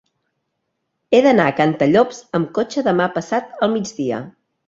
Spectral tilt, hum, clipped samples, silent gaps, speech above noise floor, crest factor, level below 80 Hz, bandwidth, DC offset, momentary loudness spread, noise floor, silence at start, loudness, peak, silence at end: -6 dB/octave; none; under 0.1%; none; 57 dB; 18 dB; -58 dBFS; 7.8 kHz; under 0.1%; 9 LU; -74 dBFS; 1.1 s; -18 LUFS; -2 dBFS; 0.35 s